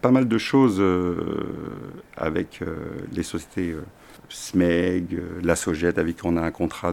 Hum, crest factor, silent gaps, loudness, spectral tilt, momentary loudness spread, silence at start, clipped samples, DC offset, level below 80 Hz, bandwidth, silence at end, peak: none; 22 dB; none; -24 LUFS; -6 dB/octave; 16 LU; 0.05 s; under 0.1%; under 0.1%; -46 dBFS; 15 kHz; 0 s; -2 dBFS